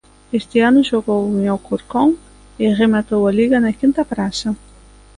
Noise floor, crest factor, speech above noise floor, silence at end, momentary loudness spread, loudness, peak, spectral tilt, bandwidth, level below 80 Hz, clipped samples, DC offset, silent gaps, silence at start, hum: -44 dBFS; 14 dB; 28 dB; 0.65 s; 10 LU; -17 LUFS; -2 dBFS; -6 dB/octave; 11 kHz; -46 dBFS; under 0.1%; under 0.1%; none; 0.3 s; 50 Hz at -45 dBFS